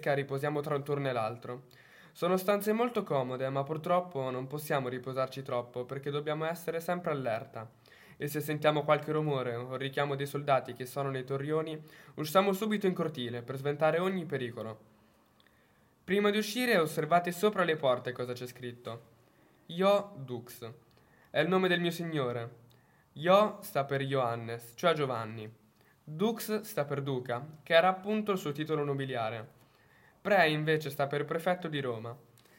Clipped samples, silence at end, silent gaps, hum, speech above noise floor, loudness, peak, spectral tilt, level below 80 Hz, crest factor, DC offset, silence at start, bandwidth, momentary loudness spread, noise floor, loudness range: under 0.1%; 0.4 s; none; none; 34 dB; -32 LUFS; -10 dBFS; -5.5 dB/octave; -78 dBFS; 22 dB; under 0.1%; 0 s; 16.5 kHz; 15 LU; -66 dBFS; 4 LU